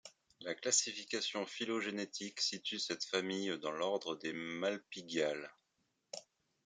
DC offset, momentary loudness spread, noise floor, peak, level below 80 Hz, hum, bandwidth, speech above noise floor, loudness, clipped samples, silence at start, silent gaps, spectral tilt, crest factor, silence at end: under 0.1%; 17 LU; -82 dBFS; -18 dBFS; -88 dBFS; none; 11 kHz; 43 dB; -38 LUFS; under 0.1%; 0.05 s; none; -2 dB/octave; 22 dB; 0.45 s